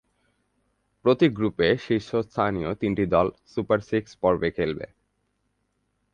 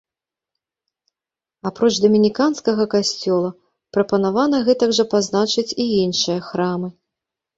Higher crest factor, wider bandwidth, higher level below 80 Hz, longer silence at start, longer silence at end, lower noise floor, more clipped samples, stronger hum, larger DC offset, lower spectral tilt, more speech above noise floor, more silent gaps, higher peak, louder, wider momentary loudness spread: about the same, 20 dB vs 16 dB; about the same, 8.6 kHz vs 8 kHz; first, -50 dBFS vs -60 dBFS; second, 1.05 s vs 1.65 s; first, 1.3 s vs 0.65 s; second, -73 dBFS vs -89 dBFS; neither; neither; neither; first, -7.5 dB/octave vs -4.5 dB/octave; second, 50 dB vs 71 dB; neither; about the same, -6 dBFS vs -4 dBFS; second, -24 LUFS vs -18 LUFS; about the same, 8 LU vs 9 LU